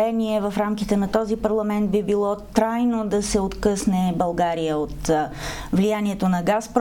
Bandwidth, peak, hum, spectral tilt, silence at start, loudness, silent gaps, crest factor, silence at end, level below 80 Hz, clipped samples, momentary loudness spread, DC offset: 17 kHz; -4 dBFS; none; -6 dB/octave; 0 s; -22 LUFS; none; 18 dB; 0 s; -40 dBFS; under 0.1%; 3 LU; under 0.1%